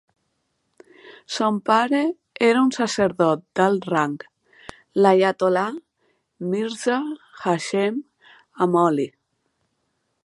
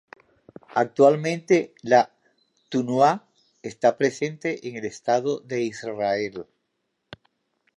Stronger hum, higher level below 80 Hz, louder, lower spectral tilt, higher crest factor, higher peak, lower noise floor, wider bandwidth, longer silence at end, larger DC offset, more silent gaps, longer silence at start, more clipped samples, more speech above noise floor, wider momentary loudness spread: neither; about the same, -66 dBFS vs -70 dBFS; about the same, -21 LUFS vs -23 LUFS; about the same, -5.5 dB/octave vs -5.5 dB/octave; about the same, 20 dB vs 20 dB; about the same, -2 dBFS vs -4 dBFS; about the same, -73 dBFS vs -76 dBFS; about the same, 11.5 kHz vs 11 kHz; second, 1.15 s vs 1.35 s; neither; neither; first, 1.05 s vs 0.75 s; neither; about the same, 53 dB vs 54 dB; about the same, 11 LU vs 13 LU